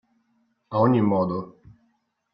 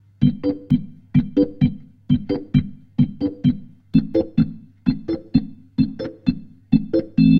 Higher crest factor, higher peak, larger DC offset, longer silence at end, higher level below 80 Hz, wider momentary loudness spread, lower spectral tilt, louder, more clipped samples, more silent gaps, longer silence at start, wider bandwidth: about the same, 18 dB vs 18 dB; second, -8 dBFS vs -2 dBFS; neither; first, 0.85 s vs 0 s; second, -62 dBFS vs -40 dBFS; first, 13 LU vs 6 LU; about the same, -11.5 dB/octave vs -11 dB/octave; about the same, -23 LUFS vs -22 LUFS; neither; neither; first, 0.7 s vs 0.2 s; about the same, 5.4 kHz vs 5.6 kHz